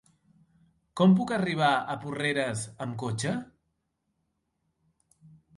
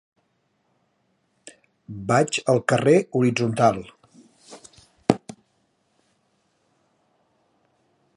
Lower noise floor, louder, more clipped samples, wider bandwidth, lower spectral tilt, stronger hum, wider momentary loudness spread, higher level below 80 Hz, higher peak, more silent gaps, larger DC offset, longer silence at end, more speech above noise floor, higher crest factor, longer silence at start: first, -78 dBFS vs -70 dBFS; second, -28 LUFS vs -21 LUFS; neither; about the same, 11.5 kHz vs 11.5 kHz; about the same, -5.5 dB/octave vs -5.5 dB/octave; neither; second, 13 LU vs 26 LU; about the same, -66 dBFS vs -62 dBFS; second, -10 dBFS vs 0 dBFS; neither; neither; second, 2.15 s vs 3 s; about the same, 52 dB vs 50 dB; second, 20 dB vs 26 dB; second, 0.95 s vs 1.9 s